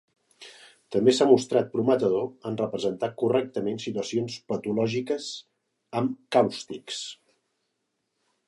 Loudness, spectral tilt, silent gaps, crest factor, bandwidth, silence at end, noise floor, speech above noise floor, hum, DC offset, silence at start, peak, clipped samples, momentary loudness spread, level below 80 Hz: -26 LUFS; -5.5 dB/octave; none; 22 dB; 11.5 kHz; 1.35 s; -78 dBFS; 53 dB; none; under 0.1%; 0.4 s; -6 dBFS; under 0.1%; 14 LU; -70 dBFS